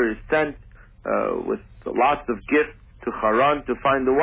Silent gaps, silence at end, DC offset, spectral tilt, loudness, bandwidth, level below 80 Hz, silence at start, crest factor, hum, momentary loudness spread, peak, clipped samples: none; 0 s; under 0.1%; -9 dB/octave; -23 LUFS; 3.9 kHz; -46 dBFS; 0 s; 16 dB; none; 10 LU; -8 dBFS; under 0.1%